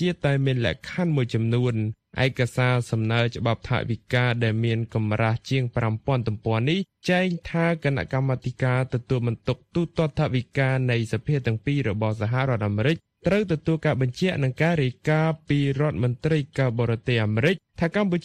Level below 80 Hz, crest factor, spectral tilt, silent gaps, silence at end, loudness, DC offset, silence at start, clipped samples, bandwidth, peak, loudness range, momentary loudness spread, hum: -50 dBFS; 16 dB; -7.5 dB/octave; none; 0.05 s; -24 LUFS; under 0.1%; 0 s; under 0.1%; 10 kHz; -8 dBFS; 1 LU; 3 LU; none